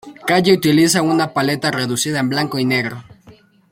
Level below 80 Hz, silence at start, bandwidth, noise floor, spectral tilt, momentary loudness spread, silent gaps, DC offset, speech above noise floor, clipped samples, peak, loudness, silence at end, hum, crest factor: -56 dBFS; 0.05 s; 16.5 kHz; -47 dBFS; -4.5 dB/octave; 6 LU; none; under 0.1%; 31 dB; under 0.1%; -2 dBFS; -16 LUFS; 0.4 s; none; 16 dB